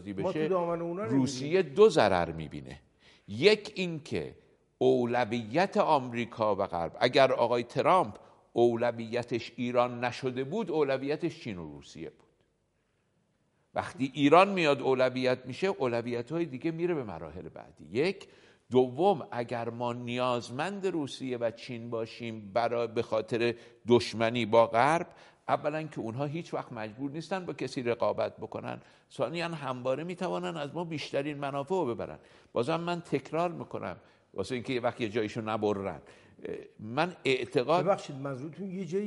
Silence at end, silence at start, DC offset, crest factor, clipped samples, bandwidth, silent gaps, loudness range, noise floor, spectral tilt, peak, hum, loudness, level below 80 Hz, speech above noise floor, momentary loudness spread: 0 s; 0 s; under 0.1%; 22 dB; under 0.1%; 11.5 kHz; none; 7 LU; -74 dBFS; -6 dB/octave; -8 dBFS; none; -30 LUFS; -66 dBFS; 44 dB; 15 LU